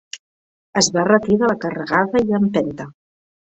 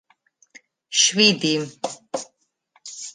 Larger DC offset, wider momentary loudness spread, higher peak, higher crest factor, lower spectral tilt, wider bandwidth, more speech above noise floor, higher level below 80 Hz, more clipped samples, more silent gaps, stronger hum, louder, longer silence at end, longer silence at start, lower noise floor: neither; about the same, 20 LU vs 21 LU; about the same, -2 dBFS vs -2 dBFS; second, 18 dB vs 24 dB; first, -4 dB/octave vs -2 dB/octave; second, 8.4 kHz vs 11 kHz; first, over 73 dB vs 43 dB; first, -54 dBFS vs -74 dBFS; neither; first, 0.19-0.73 s vs none; neither; about the same, -18 LUFS vs -19 LUFS; first, 0.6 s vs 0.05 s; second, 0.15 s vs 0.9 s; first, under -90 dBFS vs -64 dBFS